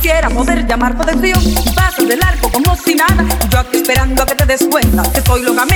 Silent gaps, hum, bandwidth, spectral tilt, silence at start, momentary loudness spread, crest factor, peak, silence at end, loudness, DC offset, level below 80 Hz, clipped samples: none; none; over 20 kHz; -4.5 dB/octave; 0 s; 2 LU; 10 dB; 0 dBFS; 0 s; -12 LUFS; under 0.1%; -16 dBFS; under 0.1%